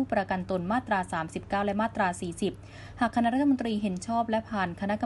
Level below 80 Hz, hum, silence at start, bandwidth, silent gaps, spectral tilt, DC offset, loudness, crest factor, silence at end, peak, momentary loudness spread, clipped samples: -54 dBFS; none; 0 s; 11.5 kHz; none; -6 dB/octave; under 0.1%; -29 LUFS; 16 dB; 0 s; -12 dBFS; 7 LU; under 0.1%